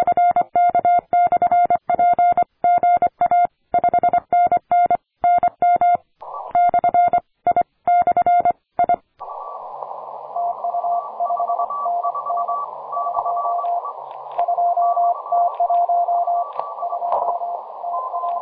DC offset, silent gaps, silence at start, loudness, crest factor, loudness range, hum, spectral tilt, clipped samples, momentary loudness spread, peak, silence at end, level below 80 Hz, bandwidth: under 0.1%; none; 0 s; -19 LUFS; 12 dB; 6 LU; none; -9 dB/octave; under 0.1%; 11 LU; -6 dBFS; 0 s; -58 dBFS; 3.7 kHz